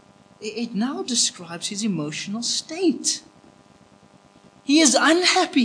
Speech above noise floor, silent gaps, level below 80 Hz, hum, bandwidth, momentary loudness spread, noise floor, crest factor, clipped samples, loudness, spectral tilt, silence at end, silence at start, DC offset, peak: 31 dB; none; -72 dBFS; none; 10.5 kHz; 14 LU; -53 dBFS; 22 dB; under 0.1%; -21 LUFS; -2 dB/octave; 0 s; 0.4 s; under 0.1%; -2 dBFS